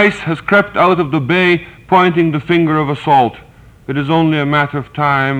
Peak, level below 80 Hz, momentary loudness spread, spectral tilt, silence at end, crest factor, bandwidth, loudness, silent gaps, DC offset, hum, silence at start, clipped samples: 0 dBFS; -46 dBFS; 7 LU; -7.5 dB/octave; 0 s; 12 dB; 9.2 kHz; -13 LUFS; none; under 0.1%; none; 0 s; under 0.1%